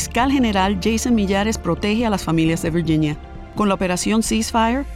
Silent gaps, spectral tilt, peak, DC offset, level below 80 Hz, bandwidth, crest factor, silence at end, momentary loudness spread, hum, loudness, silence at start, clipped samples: none; -5 dB/octave; -4 dBFS; under 0.1%; -34 dBFS; 16 kHz; 14 dB; 0 s; 4 LU; none; -19 LUFS; 0 s; under 0.1%